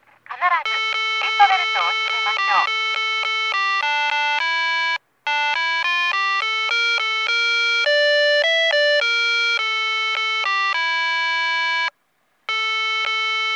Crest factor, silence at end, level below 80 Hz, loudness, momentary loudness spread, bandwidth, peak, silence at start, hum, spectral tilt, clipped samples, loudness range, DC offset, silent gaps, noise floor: 20 dB; 0 s; -84 dBFS; -18 LUFS; 5 LU; 10 kHz; 0 dBFS; 0.3 s; none; 2.5 dB/octave; under 0.1%; 3 LU; under 0.1%; none; -66 dBFS